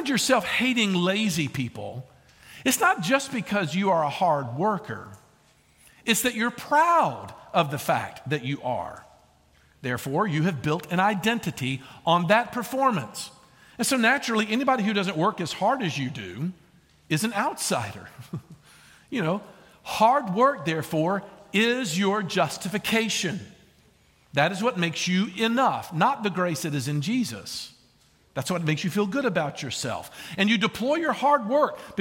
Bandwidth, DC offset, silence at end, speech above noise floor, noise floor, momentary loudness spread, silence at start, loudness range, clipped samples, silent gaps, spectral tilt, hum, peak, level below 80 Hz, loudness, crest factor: 17 kHz; under 0.1%; 0 s; 36 dB; -61 dBFS; 12 LU; 0 s; 4 LU; under 0.1%; none; -4.5 dB/octave; none; -6 dBFS; -64 dBFS; -25 LUFS; 20 dB